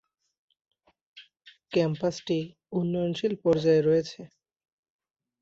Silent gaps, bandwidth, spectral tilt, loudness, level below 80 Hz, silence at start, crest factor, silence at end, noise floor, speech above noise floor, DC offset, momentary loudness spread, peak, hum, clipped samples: none; 7.8 kHz; -7 dB/octave; -27 LUFS; -66 dBFS; 1.15 s; 16 dB; 1.15 s; -58 dBFS; 32 dB; under 0.1%; 10 LU; -12 dBFS; none; under 0.1%